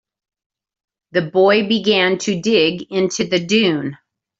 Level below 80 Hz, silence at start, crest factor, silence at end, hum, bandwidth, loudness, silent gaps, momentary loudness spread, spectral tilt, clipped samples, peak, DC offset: -60 dBFS; 1.15 s; 16 dB; 0.45 s; none; 8 kHz; -16 LUFS; none; 8 LU; -4.5 dB/octave; under 0.1%; -2 dBFS; under 0.1%